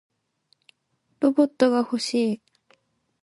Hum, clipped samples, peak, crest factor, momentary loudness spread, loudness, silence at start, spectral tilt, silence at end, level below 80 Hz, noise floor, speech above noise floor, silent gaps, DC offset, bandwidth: none; under 0.1%; -6 dBFS; 20 dB; 6 LU; -23 LUFS; 1.2 s; -4.5 dB/octave; 0.85 s; -76 dBFS; -72 dBFS; 50 dB; none; under 0.1%; 11.5 kHz